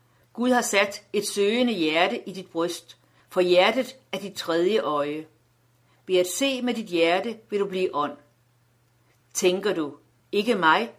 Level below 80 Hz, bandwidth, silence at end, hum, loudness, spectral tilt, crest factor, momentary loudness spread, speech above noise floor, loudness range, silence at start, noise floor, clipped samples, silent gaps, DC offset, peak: -74 dBFS; 16 kHz; 0.05 s; none; -24 LUFS; -3.5 dB/octave; 22 dB; 12 LU; 40 dB; 3 LU; 0.35 s; -64 dBFS; under 0.1%; none; under 0.1%; -4 dBFS